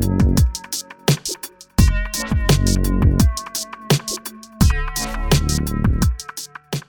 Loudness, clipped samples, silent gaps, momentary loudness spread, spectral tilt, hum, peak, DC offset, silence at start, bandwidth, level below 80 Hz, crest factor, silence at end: -20 LUFS; under 0.1%; none; 11 LU; -5 dB/octave; none; 0 dBFS; under 0.1%; 0 s; 19.5 kHz; -22 dBFS; 18 dB; 0.05 s